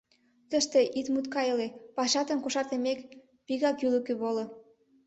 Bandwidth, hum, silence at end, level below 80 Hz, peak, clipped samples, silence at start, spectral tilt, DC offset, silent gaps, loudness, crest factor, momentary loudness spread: 8.4 kHz; none; 0.45 s; -74 dBFS; -14 dBFS; under 0.1%; 0.5 s; -2.5 dB/octave; under 0.1%; none; -30 LUFS; 18 dB; 9 LU